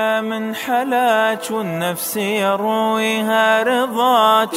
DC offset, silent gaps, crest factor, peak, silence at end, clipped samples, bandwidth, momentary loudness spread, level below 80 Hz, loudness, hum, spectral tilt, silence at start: under 0.1%; none; 14 dB; -2 dBFS; 0 s; under 0.1%; 16 kHz; 8 LU; -70 dBFS; -17 LUFS; none; -3.5 dB/octave; 0 s